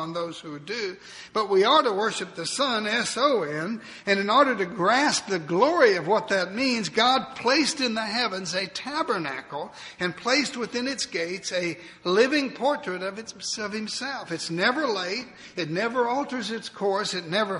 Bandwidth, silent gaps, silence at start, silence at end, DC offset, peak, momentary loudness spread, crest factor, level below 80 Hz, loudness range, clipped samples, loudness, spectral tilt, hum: 11 kHz; none; 0 s; 0 s; under 0.1%; -6 dBFS; 12 LU; 20 dB; -68 dBFS; 5 LU; under 0.1%; -25 LUFS; -3 dB/octave; none